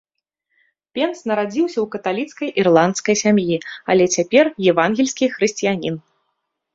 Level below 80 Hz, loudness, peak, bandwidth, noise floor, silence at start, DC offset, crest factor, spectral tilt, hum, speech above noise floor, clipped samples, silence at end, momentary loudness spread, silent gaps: -60 dBFS; -18 LUFS; -2 dBFS; 7.8 kHz; -74 dBFS; 0.95 s; under 0.1%; 18 dB; -4.5 dB/octave; none; 56 dB; under 0.1%; 0.75 s; 9 LU; none